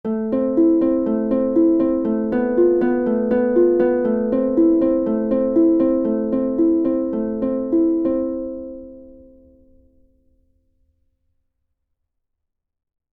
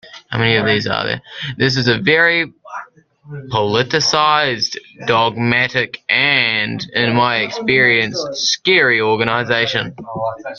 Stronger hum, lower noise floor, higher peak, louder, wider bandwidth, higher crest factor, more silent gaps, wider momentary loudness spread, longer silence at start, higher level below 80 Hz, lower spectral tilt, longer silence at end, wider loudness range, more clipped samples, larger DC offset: neither; first, -78 dBFS vs -39 dBFS; second, -6 dBFS vs 0 dBFS; second, -18 LUFS vs -15 LUFS; second, 3.3 kHz vs 7.4 kHz; about the same, 14 dB vs 16 dB; neither; second, 6 LU vs 12 LU; about the same, 0.05 s vs 0.05 s; about the same, -48 dBFS vs -52 dBFS; first, -11.5 dB/octave vs -4 dB/octave; first, 4 s vs 0 s; first, 7 LU vs 3 LU; neither; neither